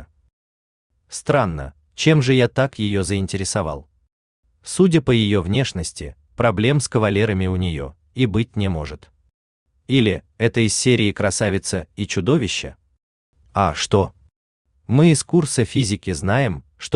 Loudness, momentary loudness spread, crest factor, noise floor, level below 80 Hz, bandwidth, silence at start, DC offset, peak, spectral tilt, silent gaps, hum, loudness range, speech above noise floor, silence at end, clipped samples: -19 LUFS; 13 LU; 18 dB; under -90 dBFS; -44 dBFS; 12.5 kHz; 0 s; under 0.1%; -2 dBFS; -5.5 dB/octave; 0.33-0.90 s, 4.12-4.43 s, 9.34-9.66 s, 13.03-13.33 s, 14.36-14.65 s; none; 3 LU; over 71 dB; 0 s; under 0.1%